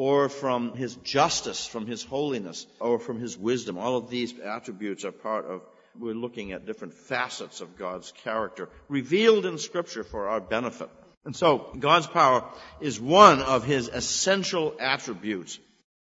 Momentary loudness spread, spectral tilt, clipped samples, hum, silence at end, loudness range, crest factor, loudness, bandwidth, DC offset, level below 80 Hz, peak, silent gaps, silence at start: 16 LU; -3.5 dB/octave; under 0.1%; none; 0.5 s; 13 LU; 26 dB; -26 LUFS; 8 kHz; under 0.1%; -58 dBFS; 0 dBFS; 11.17-11.21 s; 0 s